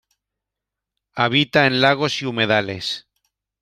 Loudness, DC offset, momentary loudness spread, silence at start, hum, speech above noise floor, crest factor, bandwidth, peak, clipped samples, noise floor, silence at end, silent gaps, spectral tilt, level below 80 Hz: -18 LUFS; under 0.1%; 11 LU; 1.15 s; none; 66 dB; 20 dB; 14 kHz; -2 dBFS; under 0.1%; -85 dBFS; 0.6 s; none; -5 dB/octave; -60 dBFS